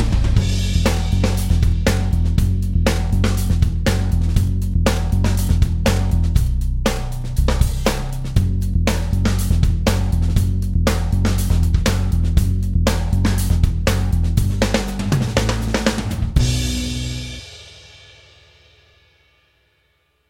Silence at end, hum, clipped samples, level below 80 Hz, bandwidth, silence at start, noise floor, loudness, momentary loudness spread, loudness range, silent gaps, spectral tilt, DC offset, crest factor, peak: 2.5 s; none; under 0.1%; -20 dBFS; 16.5 kHz; 0 s; -63 dBFS; -19 LUFS; 4 LU; 4 LU; none; -5.5 dB/octave; under 0.1%; 16 dB; -2 dBFS